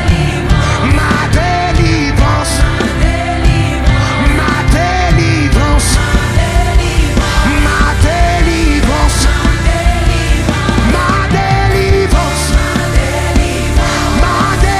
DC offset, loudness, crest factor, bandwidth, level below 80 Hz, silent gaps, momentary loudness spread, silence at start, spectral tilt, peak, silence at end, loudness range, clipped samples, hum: under 0.1%; -11 LUFS; 10 dB; 13.5 kHz; -14 dBFS; none; 2 LU; 0 s; -5 dB/octave; 0 dBFS; 0 s; 1 LU; 0.2%; none